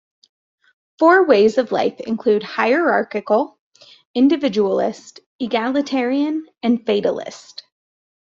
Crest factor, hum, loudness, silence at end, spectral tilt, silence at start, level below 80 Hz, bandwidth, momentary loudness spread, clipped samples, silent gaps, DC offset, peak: 16 dB; none; -18 LUFS; 0.9 s; -5.5 dB/octave; 1 s; -66 dBFS; 7.6 kHz; 15 LU; under 0.1%; 3.59-3.72 s, 4.05-4.14 s, 5.26-5.39 s; under 0.1%; -2 dBFS